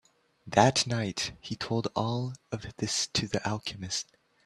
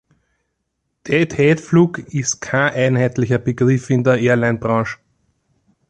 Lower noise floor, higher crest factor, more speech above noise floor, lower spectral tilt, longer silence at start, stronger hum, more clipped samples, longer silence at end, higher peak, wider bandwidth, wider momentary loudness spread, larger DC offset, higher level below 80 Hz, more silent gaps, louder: second, -53 dBFS vs -73 dBFS; first, 26 dB vs 16 dB; second, 23 dB vs 57 dB; second, -4 dB/octave vs -6 dB/octave; second, 0.45 s vs 1.05 s; neither; neither; second, 0.45 s vs 0.95 s; about the same, -4 dBFS vs -2 dBFS; first, 13 kHz vs 9.2 kHz; first, 13 LU vs 6 LU; neither; second, -60 dBFS vs -50 dBFS; neither; second, -30 LUFS vs -17 LUFS